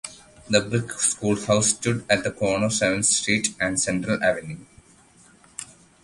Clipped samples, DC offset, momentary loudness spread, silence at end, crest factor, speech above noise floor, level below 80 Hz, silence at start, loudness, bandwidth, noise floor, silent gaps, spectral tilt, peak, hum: under 0.1%; under 0.1%; 18 LU; 0.4 s; 22 dB; 31 dB; -54 dBFS; 0.05 s; -22 LUFS; 11.5 kHz; -54 dBFS; none; -3 dB/octave; -2 dBFS; none